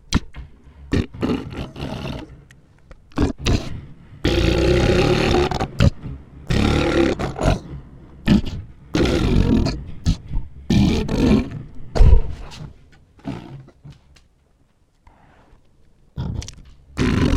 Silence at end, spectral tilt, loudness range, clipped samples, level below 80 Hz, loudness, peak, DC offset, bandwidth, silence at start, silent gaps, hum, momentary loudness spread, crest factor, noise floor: 0 s; -6.5 dB/octave; 18 LU; under 0.1%; -26 dBFS; -20 LUFS; 0 dBFS; under 0.1%; 14 kHz; 0.1 s; none; none; 20 LU; 20 dB; -58 dBFS